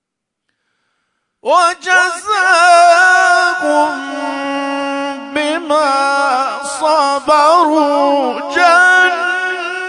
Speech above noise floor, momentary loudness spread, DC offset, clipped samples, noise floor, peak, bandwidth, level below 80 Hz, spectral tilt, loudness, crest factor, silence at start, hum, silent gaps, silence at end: 61 dB; 11 LU; under 0.1%; under 0.1%; -73 dBFS; 0 dBFS; 11 kHz; -62 dBFS; -0.5 dB/octave; -12 LUFS; 12 dB; 1.45 s; none; none; 0 s